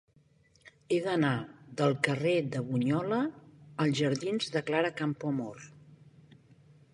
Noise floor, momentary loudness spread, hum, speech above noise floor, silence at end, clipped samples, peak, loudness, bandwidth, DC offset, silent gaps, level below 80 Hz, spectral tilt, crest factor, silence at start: -65 dBFS; 9 LU; none; 35 dB; 1 s; under 0.1%; -12 dBFS; -31 LUFS; 11.5 kHz; under 0.1%; none; -72 dBFS; -6 dB/octave; 20 dB; 0.65 s